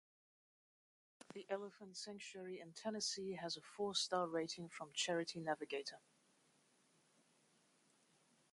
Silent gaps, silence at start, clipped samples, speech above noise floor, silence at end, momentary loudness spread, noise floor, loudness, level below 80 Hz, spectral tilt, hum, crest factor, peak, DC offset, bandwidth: none; 1.3 s; under 0.1%; 31 dB; 2.55 s; 12 LU; -76 dBFS; -44 LUFS; -90 dBFS; -2.5 dB/octave; none; 20 dB; -28 dBFS; under 0.1%; 11.5 kHz